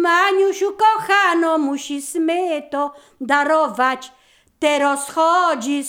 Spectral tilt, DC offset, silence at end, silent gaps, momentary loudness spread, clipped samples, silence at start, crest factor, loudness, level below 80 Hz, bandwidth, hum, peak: -2 dB/octave; under 0.1%; 0 s; none; 10 LU; under 0.1%; 0 s; 14 dB; -18 LUFS; -66 dBFS; 19.5 kHz; none; -4 dBFS